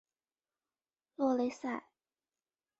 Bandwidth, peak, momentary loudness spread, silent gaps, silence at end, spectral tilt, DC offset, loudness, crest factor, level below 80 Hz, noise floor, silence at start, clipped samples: 8 kHz; -20 dBFS; 13 LU; none; 1 s; -4 dB/octave; under 0.1%; -36 LUFS; 20 dB; -82 dBFS; under -90 dBFS; 1.2 s; under 0.1%